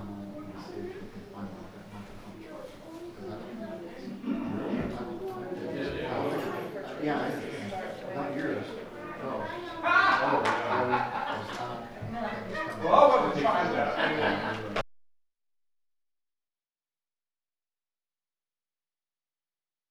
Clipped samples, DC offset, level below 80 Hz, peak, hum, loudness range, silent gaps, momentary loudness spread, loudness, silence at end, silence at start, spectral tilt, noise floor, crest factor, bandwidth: under 0.1%; under 0.1%; -58 dBFS; -6 dBFS; none; 16 LU; none; 20 LU; -30 LUFS; 4.85 s; 0 s; -5.5 dB/octave; under -90 dBFS; 26 dB; over 20 kHz